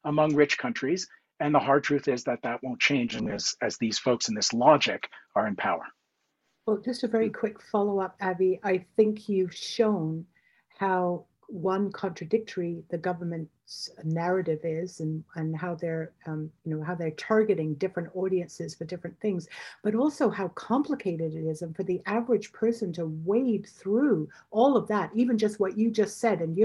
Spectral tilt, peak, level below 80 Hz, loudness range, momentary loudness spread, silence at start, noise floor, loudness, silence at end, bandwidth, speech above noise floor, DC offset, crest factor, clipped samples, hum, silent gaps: -5 dB/octave; -6 dBFS; -70 dBFS; 6 LU; 11 LU; 0.05 s; -77 dBFS; -28 LUFS; 0 s; 12 kHz; 50 dB; under 0.1%; 20 dB; under 0.1%; none; none